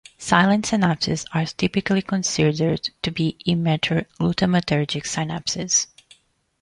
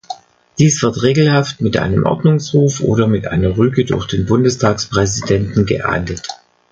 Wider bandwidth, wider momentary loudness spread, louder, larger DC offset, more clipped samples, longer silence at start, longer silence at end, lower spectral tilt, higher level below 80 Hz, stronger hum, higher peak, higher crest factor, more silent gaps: first, 11 kHz vs 8.8 kHz; about the same, 6 LU vs 7 LU; second, -21 LUFS vs -15 LUFS; neither; neither; about the same, 0.2 s vs 0.1 s; first, 0.75 s vs 0.35 s; about the same, -4.5 dB/octave vs -5.5 dB/octave; second, -50 dBFS vs -36 dBFS; neither; about the same, -2 dBFS vs 0 dBFS; first, 20 dB vs 14 dB; neither